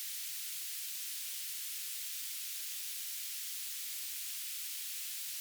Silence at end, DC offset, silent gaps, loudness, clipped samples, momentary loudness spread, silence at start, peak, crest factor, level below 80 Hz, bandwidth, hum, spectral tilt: 0 s; under 0.1%; none; -38 LUFS; under 0.1%; 0 LU; 0 s; -28 dBFS; 14 dB; under -90 dBFS; over 20 kHz; none; 10 dB/octave